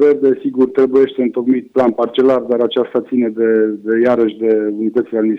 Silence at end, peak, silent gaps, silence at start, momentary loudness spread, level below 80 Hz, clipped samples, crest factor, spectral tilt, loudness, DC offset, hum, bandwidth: 0 s; -4 dBFS; none; 0 s; 4 LU; -60 dBFS; under 0.1%; 10 dB; -8 dB/octave; -15 LUFS; under 0.1%; none; 5.4 kHz